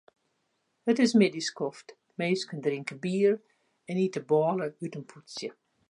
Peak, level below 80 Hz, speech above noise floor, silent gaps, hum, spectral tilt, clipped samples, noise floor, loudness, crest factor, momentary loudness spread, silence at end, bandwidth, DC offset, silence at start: -10 dBFS; -80 dBFS; 48 dB; none; none; -5.5 dB/octave; under 0.1%; -76 dBFS; -29 LUFS; 20 dB; 16 LU; 0.4 s; 11 kHz; under 0.1%; 0.85 s